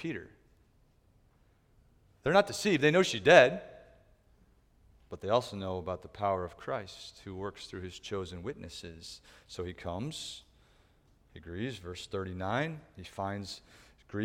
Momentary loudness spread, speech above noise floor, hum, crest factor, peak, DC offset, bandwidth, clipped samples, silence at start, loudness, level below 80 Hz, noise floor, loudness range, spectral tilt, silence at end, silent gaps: 21 LU; 34 dB; none; 28 dB; -6 dBFS; under 0.1%; 16 kHz; under 0.1%; 0 s; -31 LUFS; -62 dBFS; -66 dBFS; 15 LU; -4.5 dB/octave; 0 s; none